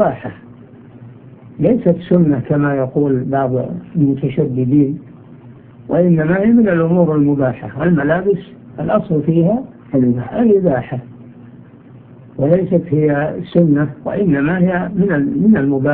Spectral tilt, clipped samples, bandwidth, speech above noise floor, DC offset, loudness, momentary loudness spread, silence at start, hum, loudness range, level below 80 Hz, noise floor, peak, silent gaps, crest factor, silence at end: -13 dB/octave; under 0.1%; 3.8 kHz; 25 dB; under 0.1%; -15 LUFS; 8 LU; 0 s; none; 3 LU; -46 dBFS; -39 dBFS; 0 dBFS; none; 14 dB; 0 s